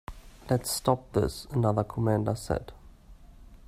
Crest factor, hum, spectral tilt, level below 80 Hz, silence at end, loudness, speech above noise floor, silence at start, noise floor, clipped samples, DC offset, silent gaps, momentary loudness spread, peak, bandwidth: 22 dB; none; -6 dB/octave; -48 dBFS; 0.1 s; -29 LUFS; 23 dB; 0.1 s; -51 dBFS; under 0.1%; under 0.1%; none; 12 LU; -8 dBFS; 16 kHz